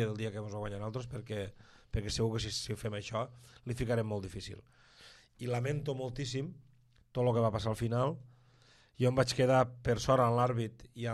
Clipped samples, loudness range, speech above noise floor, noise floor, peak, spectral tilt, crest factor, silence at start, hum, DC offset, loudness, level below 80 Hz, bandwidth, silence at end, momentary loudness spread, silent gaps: under 0.1%; 7 LU; 30 dB; -64 dBFS; -14 dBFS; -6 dB/octave; 20 dB; 0 s; none; under 0.1%; -34 LUFS; -54 dBFS; 12.5 kHz; 0 s; 15 LU; none